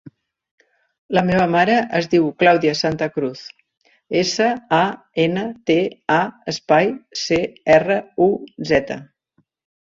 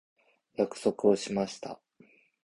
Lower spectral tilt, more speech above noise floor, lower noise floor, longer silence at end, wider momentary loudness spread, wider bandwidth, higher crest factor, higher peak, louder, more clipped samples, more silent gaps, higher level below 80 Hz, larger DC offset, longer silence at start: about the same, -5 dB/octave vs -5.5 dB/octave; first, 47 dB vs 33 dB; about the same, -65 dBFS vs -62 dBFS; about the same, 0.75 s vs 0.7 s; second, 10 LU vs 18 LU; second, 7.8 kHz vs 11.5 kHz; about the same, 18 dB vs 20 dB; first, -2 dBFS vs -12 dBFS; first, -18 LUFS vs -30 LUFS; neither; first, 3.77-3.81 s vs none; first, -54 dBFS vs -70 dBFS; neither; first, 1.1 s vs 0.6 s